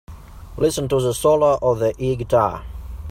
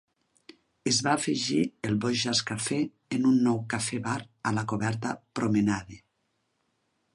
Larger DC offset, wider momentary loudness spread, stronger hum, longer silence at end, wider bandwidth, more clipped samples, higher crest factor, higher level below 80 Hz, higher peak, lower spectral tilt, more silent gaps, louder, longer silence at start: neither; first, 18 LU vs 8 LU; neither; second, 0 s vs 1.15 s; first, 16 kHz vs 11.5 kHz; neither; about the same, 16 dB vs 20 dB; first, -38 dBFS vs -62 dBFS; first, -4 dBFS vs -10 dBFS; first, -6 dB/octave vs -4 dB/octave; neither; first, -19 LUFS vs -28 LUFS; second, 0.1 s vs 0.85 s